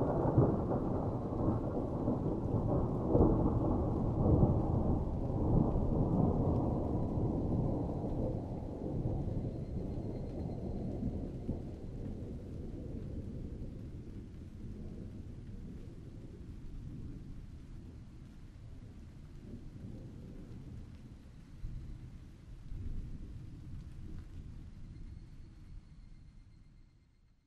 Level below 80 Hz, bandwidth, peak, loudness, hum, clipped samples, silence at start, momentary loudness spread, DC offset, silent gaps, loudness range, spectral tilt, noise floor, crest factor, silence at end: -44 dBFS; 7.4 kHz; -14 dBFS; -36 LUFS; none; under 0.1%; 0 s; 21 LU; under 0.1%; none; 19 LU; -11 dB/octave; -66 dBFS; 22 dB; 0.65 s